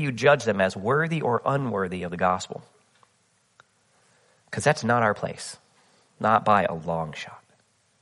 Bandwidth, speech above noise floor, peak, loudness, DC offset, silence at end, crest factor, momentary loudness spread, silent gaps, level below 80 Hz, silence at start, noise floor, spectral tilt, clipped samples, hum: 11.5 kHz; 42 dB; -4 dBFS; -24 LUFS; under 0.1%; 0.65 s; 22 dB; 17 LU; none; -62 dBFS; 0 s; -66 dBFS; -5.5 dB/octave; under 0.1%; none